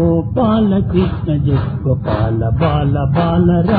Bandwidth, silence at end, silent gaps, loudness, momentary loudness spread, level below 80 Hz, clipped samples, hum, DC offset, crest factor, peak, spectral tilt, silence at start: 4.8 kHz; 0 s; none; -15 LUFS; 4 LU; -28 dBFS; under 0.1%; none; under 0.1%; 12 dB; -2 dBFS; -12 dB/octave; 0 s